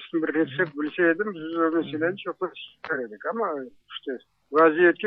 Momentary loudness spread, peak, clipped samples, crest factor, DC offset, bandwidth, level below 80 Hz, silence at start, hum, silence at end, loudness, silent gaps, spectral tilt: 16 LU; -6 dBFS; under 0.1%; 20 dB; under 0.1%; 4.9 kHz; -76 dBFS; 0 s; none; 0 s; -25 LUFS; none; -8.5 dB/octave